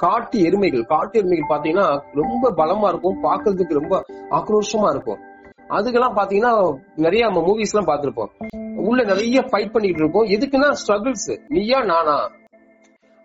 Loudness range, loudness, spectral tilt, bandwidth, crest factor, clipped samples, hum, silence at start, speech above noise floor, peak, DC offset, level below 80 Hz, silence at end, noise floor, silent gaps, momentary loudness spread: 2 LU; -19 LUFS; -4 dB/octave; 8 kHz; 14 dB; under 0.1%; none; 0 s; 35 dB; -4 dBFS; under 0.1%; -50 dBFS; 0.95 s; -54 dBFS; none; 7 LU